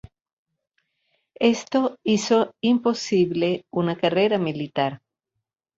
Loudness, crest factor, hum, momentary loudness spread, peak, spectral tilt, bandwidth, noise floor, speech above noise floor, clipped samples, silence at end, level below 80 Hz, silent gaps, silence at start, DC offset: -22 LUFS; 18 dB; none; 6 LU; -6 dBFS; -5.5 dB/octave; 7.8 kHz; -82 dBFS; 60 dB; under 0.1%; 0.8 s; -64 dBFS; none; 1.4 s; under 0.1%